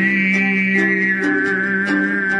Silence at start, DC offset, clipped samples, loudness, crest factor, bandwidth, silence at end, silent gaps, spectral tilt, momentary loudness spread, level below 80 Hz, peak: 0 s; under 0.1%; under 0.1%; -16 LUFS; 12 dB; 10 kHz; 0 s; none; -6.5 dB/octave; 2 LU; -60 dBFS; -4 dBFS